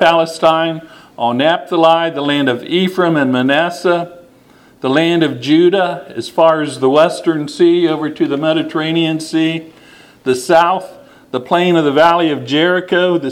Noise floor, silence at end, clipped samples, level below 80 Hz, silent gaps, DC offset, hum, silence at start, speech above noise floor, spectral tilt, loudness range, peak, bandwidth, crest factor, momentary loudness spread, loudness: -46 dBFS; 0 s; under 0.1%; -60 dBFS; none; under 0.1%; none; 0 s; 33 dB; -5.5 dB/octave; 3 LU; 0 dBFS; 14 kHz; 14 dB; 9 LU; -14 LUFS